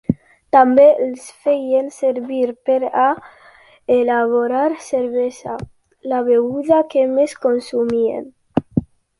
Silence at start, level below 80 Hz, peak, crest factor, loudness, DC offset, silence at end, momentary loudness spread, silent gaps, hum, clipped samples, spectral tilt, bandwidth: 0.1 s; -52 dBFS; -2 dBFS; 16 dB; -17 LUFS; under 0.1%; 0.35 s; 13 LU; none; none; under 0.1%; -7 dB/octave; 11.5 kHz